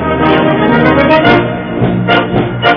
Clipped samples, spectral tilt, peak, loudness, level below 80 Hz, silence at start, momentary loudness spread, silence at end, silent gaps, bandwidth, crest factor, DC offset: 0.7%; -8.5 dB/octave; 0 dBFS; -9 LUFS; -32 dBFS; 0 s; 6 LU; 0 s; none; 5.4 kHz; 10 dB; under 0.1%